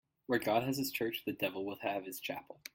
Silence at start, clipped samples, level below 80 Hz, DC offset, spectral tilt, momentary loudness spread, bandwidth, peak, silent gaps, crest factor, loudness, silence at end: 0.3 s; under 0.1%; -74 dBFS; under 0.1%; -4.5 dB/octave; 9 LU; 17 kHz; -18 dBFS; none; 20 dB; -37 LUFS; 0.05 s